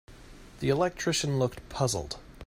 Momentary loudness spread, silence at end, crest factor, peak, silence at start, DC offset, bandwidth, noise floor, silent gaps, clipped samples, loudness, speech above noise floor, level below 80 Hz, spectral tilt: 6 LU; 0 s; 18 dB; -12 dBFS; 0.1 s; under 0.1%; 16 kHz; -49 dBFS; none; under 0.1%; -29 LUFS; 20 dB; -50 dBFS; -4.5 dB/octave